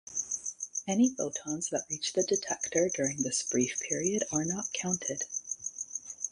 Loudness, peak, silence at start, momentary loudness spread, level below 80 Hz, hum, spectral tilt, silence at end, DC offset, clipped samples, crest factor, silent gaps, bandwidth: -31 LUFS; -14 dBFS; 0.05 s; 8 LU; -70 dBFS; none; -3 dB/octave; 0 s; under 0.1%; under 0.1%; 18 dB; none; 11.5 kHz